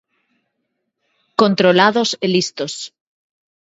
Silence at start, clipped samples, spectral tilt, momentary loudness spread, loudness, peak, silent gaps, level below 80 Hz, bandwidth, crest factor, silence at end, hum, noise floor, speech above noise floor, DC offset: 1.4 s; under 0.1%; -4.5 dB/octave; 14 LU; -16 LUFS; 0 dBFS; none; -66 dBFS; 8 kHz; 18 dB; 0.75 s; none; -74 dBFS; 58 dB; under 0.1%